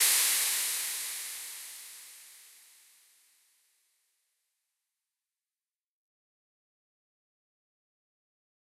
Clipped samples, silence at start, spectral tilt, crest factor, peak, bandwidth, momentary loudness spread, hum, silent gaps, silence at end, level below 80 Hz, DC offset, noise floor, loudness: under 0.1%; 0 s; 4.5 dB/octave; 26 dB; -12 dBFS; 16 kHz; 24 LU; none; none; 6.15 s; under -90 dBFS; under 0.1%; under -90 dBFS; -29 LUFS